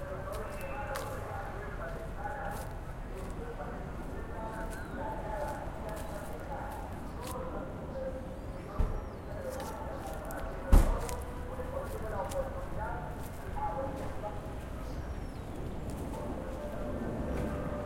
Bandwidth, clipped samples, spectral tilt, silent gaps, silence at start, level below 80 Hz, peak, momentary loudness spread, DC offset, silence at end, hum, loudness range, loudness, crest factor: 16.5 kHz; under 0.1%; -6.5 dB/octave; none; 0 s; -38 dBFS; -8 dBFS; 6 LU; under 0.1%; 0 s; none; 6 LU; -39 LUFS; 26 dB